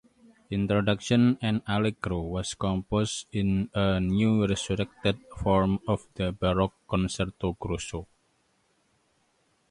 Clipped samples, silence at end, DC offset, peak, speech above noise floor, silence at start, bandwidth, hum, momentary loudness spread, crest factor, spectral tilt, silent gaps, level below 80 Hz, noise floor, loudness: under 0.1%; 1.65 s; under 0.1%; -10 dBFS; 43 dB; 0.5 s; 11.5 kHz; none; 8 LU; 18 dB; -6 dB/octave; none; -44 dBFS; -70 dBFS; -28 LUFS